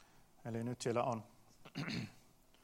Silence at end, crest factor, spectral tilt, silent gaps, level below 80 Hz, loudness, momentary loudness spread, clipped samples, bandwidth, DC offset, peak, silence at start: 0.45 s; 20 dB; -5.5 dB/octave; none; -72 dBFS; -42 LUFS; 16 LU; under 0.1%; 16 kHz; under 0.1%; -22 dBFS; 0 s